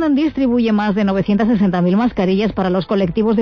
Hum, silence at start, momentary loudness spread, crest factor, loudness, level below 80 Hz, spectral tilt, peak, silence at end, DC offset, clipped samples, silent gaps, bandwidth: none; 0 s; 2 LU; 10 dB; -16 LUFS; -40 dBFS; -9 dB/octave; -6 dBFS; 0 s; under 0.1%; under 0.1%; none; 6.4 kHz